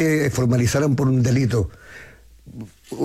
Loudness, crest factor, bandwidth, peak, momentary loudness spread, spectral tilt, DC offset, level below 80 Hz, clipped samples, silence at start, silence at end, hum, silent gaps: -20 LUFS; 12 dB; 14.5 kHz; -8 dBFS; 20 LU; -6.5 dB/octave; under 0.1%; -44 dBFS; under 0.1%; 0 s; 0 s; none; none